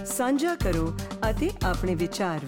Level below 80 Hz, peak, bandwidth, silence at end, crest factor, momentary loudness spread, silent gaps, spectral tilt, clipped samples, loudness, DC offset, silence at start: -34 dBFS; -16 dBFS; 17 kHz; 0 s; 10 dB; 4 LU; none; -5 dB/octave; under 0.1%; -27 LUFS; under 0.1%; 0 s